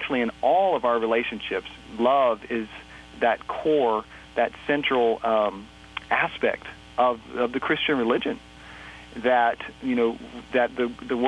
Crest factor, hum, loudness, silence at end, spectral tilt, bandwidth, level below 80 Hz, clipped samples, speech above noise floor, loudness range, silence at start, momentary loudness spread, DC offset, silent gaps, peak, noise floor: 18 dB; none; -24 LUFS; 0 s; -5.5 dB/octave; 10 kHz; -54 dBFS; under 0.1%; 19 dB; 1 LU; 0 s; 16 LU; under 0.1%; none; -8 dBFS; -43 dBFS